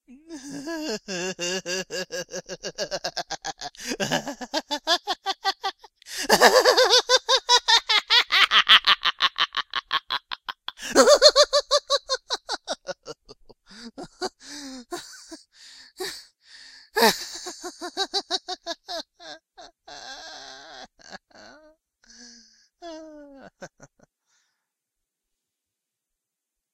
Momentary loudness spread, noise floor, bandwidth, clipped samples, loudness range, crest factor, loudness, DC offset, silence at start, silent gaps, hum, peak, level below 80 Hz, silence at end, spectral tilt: 25 LU; -85 dBFS; 16 kHz; under 0.1%; 20 LU; 26 dB; -21 LUFS; under 0.1%; 0.1 s; none; none; 0 dBFS; -60 dBFS; 3.05 s; -0.5 dB/octave